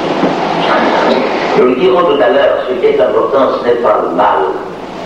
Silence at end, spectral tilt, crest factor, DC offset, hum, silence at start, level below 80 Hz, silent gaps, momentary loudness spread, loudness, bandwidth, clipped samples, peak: 0 s; -6 dB/octave; 10 dB; under 0.1%; none; 0 s; -46 dBFS; none; 4 LU; -11 LUFS; 8.8 kHz; under 0.1%; 0 dBFS